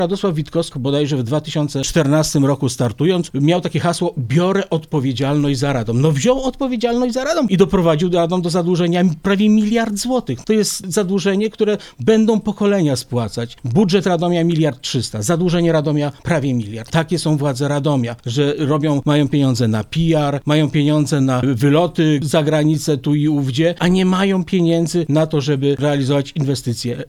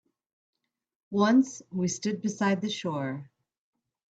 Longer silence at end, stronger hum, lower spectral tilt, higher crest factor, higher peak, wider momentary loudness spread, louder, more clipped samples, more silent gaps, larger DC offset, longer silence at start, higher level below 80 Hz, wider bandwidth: second, 0.05 s vs 0.85 s; neither; about the same, -6 dB/octave vs -5 dB/octave; about the same, 16 dB vs 18 dB; first, 0 dBFS vs -12 dBFS; second, 5 LU vs 11 LU; first, -17 LUFS vs -28 LUFS; neither; neither; neither; second, 0 s vs 1.1 s; first, -42 dBFS vs -72 dBFS; first, 15 kHz vs 8.6 kHz